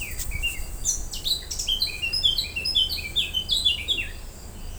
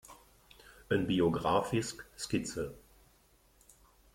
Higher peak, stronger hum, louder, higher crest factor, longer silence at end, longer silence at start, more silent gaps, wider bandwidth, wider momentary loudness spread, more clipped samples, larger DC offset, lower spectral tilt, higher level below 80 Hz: first, -8 dBFS vs -16 dBFS; neither; first, -24 LUFS vs -33 LUFS; about the same, 18 dB vs 20 dB; second, 0 s vs 1.35 s; about the same, 0 s vs 0.1 s; neither; first, over 20 kHz vs 16.5 kHz; second, 9 LU vs 13 LU; neither; neither; second, 0 dB/octave vs -5 dB/octave; first, -36 dBFS vs -60 dBFS